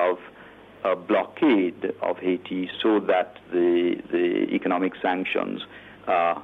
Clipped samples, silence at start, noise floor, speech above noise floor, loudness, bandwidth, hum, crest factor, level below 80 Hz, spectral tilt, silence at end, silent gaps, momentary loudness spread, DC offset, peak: under 0.1%; 0 s; -47 dBFS; 23 dB; -24 LUFS; 4.1 kHz; none; 14 dB; -66 dBFS; -7.5 dB/octave; 0 s; none; 9 LU; under 0.1%; -10 dBFS